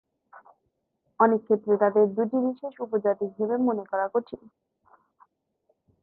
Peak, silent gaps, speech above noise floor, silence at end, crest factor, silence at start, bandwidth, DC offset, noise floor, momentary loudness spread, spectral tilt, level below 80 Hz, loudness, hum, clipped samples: -6 dBFS; none; 52 dB; 1.65 s; 22 dB; 0.35 s; 4.2 kHz; under 0.1%; -76 dBFS; 9 LU; -11 dB/octave; -74 dBFS; -25 LUFS; none; under 0.1%